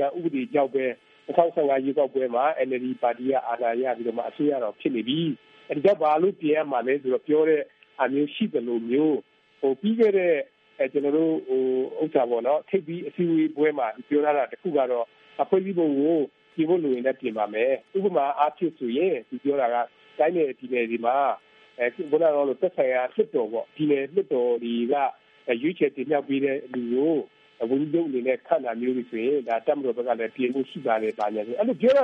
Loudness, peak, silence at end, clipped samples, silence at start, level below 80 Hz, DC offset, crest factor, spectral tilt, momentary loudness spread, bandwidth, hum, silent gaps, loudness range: -25 LUFS; -6 dBFS; 0 s; under 0.1%; 0 s; -80 dBFS; under 0.1%; 20 dB; -8.5 dB/octave; 7 LU; 5.8 kHz; none; none; 2 LU